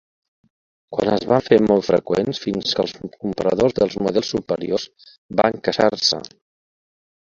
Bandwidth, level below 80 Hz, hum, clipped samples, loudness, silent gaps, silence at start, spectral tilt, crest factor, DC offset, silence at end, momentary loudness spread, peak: 7.6 kHz; -52 dBFS; none; under 0.1%; -20 LUFS; 5.18-5.29 s; 0.9 s; -5 dB/octave; 20 dB; under 0.1%; 1.05 s; 11 LU; 0 dBFS